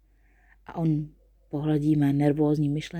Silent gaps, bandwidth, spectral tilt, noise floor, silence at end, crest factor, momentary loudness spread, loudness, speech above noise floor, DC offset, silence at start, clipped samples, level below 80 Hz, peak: none; 9.4 kHz; -8.5 dB/octave; -60 dBFS; 0 s; 16 dB; 13 LU; -25 LUFS; 36 dB; under 0.1%; 0.7 s; under 0.1%; -54 dBFS; -10 dBFS